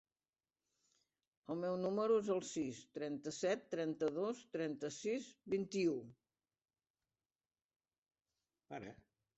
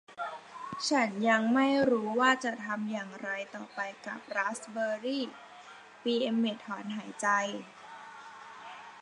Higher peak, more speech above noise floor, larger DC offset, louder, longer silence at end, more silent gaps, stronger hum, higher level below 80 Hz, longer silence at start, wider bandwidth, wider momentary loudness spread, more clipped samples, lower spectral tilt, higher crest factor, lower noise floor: second, -26 dBFS vs -12 dBFS; first, over 50 dB vs 21 dB; neither; second, -41 LUFS vs -31 LUFS; first, 0.45 s vs 0 s; first, 6.90-6.94 s, 7.65-7.69 s, 7.76-7.80 s, 7.98-8.02 s vs none; neither; about the same, -82 dBFS vs -80 dBFS; first, 1.5 s vs 0.1 s; second, 8 kHz vs 11 kHz; second, 16 LU vs 21 LU; neither; first, -5.5 dB/octave vs -4 dB/octave; about the same, 18 dB vs 20 dB; first, under -90 dBFS vs -52 dBFS